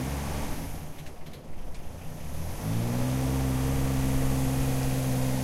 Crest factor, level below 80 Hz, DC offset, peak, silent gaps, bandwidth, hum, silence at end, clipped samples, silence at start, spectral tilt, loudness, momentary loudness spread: 14 dB; -36 dBFS; under 0.1%; -14 dBFS; none; 16 kHz; none; 0 s; under 0.1%; 0 s; -6 dB/octave; -29 LUFS; 16 LU